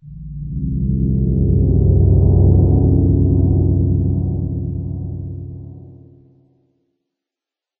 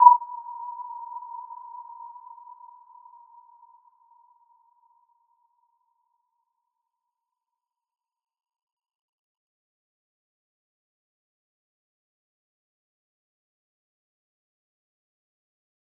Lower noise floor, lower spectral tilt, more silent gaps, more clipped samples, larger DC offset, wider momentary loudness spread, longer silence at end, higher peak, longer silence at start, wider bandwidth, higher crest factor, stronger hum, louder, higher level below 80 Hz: about the same, -88 dBFS vs -88 dBFS; first, -17 dB/octave vs 7.5 dB/octave; neither; neither; neither; second, 17 LU vs 21 LU; second, 1.85 s vs 14.6 s; about the same, -2 dBFS vs -2 dBFS; about the same, 0.05 s vs 0 s; second, 1.1 kHz vs 1.3 kHz; second, 14 dB vs 30 dB; neither; first, -16 LUFS vs -27 LUFS; first, -24 dBFS vs under -90 dBFS